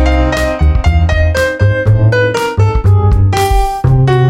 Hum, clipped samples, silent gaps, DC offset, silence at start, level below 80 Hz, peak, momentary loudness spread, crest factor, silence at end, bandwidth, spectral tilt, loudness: none; under 0.1%; none; under 0.1%; 0 s; -16 dBFS; 0 dBFS; 3 LU; 10 dB; 0 s; 14.5 kHz; -6.5 dB/octave; -11 LUFS